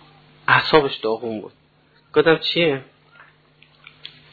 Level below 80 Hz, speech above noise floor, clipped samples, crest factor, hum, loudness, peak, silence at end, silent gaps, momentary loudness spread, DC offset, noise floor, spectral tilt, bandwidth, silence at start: -56 dBFS; 37 dB; under 0.1%; 20 dB; none; -19 LUFS; -2 dBFS; 1.5 s; none; 21 LU; under 0.1%; -57 dBFS; -7 dB/octave; 4.8 kHz; 0.5 s